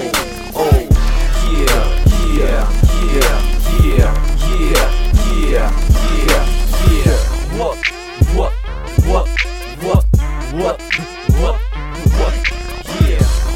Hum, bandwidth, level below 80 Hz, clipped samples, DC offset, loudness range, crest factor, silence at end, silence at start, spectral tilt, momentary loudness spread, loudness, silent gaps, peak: none; 16.5 kHz; -14 dBFS; under 0.1%; under 0.1%; 2 LU; 12 dB; 0 s; 0 s; -5.5 dB/octave; 6 LU; -16 LUFS; none; 0 dBFS